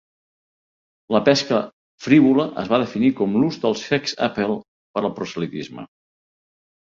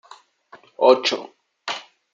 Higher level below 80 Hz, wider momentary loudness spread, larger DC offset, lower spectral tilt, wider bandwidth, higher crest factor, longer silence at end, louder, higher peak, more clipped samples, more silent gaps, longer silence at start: first, -60 dBFS vs -74 dBFS; about the same, 14 LU vs 16 LU; neither; first, -5.5 dB/octave vs -2.5 dB/octave; about the same, 7.6 kHz vs 7.6 kHz; about the same, 20 dB vs 22 dB; first, 1.05 s vs 0.3 s; about the same, -20 LUFS vs -20 LUFS; about the same, -2 dBFS vs -2 dBFS; neither; first, 1.73-1.98 s, 4.68-4.94 s vs none; first, 1.1 s vs 0.8 s